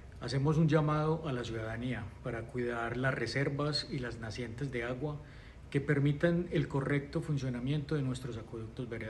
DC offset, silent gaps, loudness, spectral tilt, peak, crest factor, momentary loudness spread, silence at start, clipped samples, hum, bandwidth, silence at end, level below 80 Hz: under 0.1%; none; -34 LUFS; -7 dB/octave; -14 dBFS; 20 dB; 11 LU; 0 s; under 0.1%; none; 11.5 kHz; 0 s; -54 dBFS